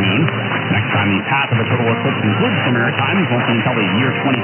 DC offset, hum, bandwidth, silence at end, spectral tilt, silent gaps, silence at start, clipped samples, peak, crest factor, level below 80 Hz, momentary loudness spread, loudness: under 0.1%; none; 3.2 kHz; 0 s; -3.5 dB/octave; none; 0 s; under 0.1%; 0 dBFS; 16 dB; -62 dBFS; 1 LU; -16 LUFS